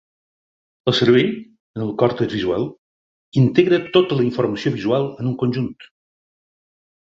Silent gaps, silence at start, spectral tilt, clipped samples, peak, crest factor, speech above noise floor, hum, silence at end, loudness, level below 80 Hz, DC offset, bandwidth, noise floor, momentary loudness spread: 1.60-1.74 s, 2.78-3.32 s; 0.85 s; -7.5 dB/octave; under 0.1%; -2 dBFS; 20 dB; over 72 dB; none; 1.2 s; -19 LUFS; -54 dBFS; under 0.1%; 7.6 kHz; under -90 dBFS; 12 LU